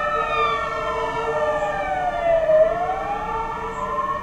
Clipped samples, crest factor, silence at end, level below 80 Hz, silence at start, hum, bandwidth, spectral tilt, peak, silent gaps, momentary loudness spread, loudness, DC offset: under 0.1%; 16 dB; 0 s; -42 dBFS; 0 s; none; 10 kHz; -5 dB/octave; -6 dBFS; none; 8 LU; -22 LUFS; under 0.1%